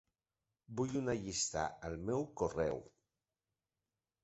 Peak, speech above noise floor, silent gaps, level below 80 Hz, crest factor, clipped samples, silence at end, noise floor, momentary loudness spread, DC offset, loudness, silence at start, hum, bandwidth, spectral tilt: -22 dBFS; over 51 dB; none; -62 dBFS; 20 dB; under 0.1%; 1.35 s; under -90 dBFS; 6 LU; under 0.1%; -39 LUFS; 0.7 s; none; 8.2 kHz; -4.5 dB/octave